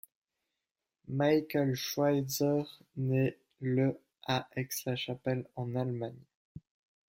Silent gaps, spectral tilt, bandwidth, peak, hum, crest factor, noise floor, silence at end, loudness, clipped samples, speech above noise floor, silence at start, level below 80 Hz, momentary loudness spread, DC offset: 6.35-6.55 s; -5.5 dB/octave; 16.5 kHz; -16 dBFS; none; 18 dB; -90 dBFS; 0.5 s; -33 LUFS; under 0.1%; 57 dB; 1.1 s; -70 dBFS; 10 LU; under 0.1%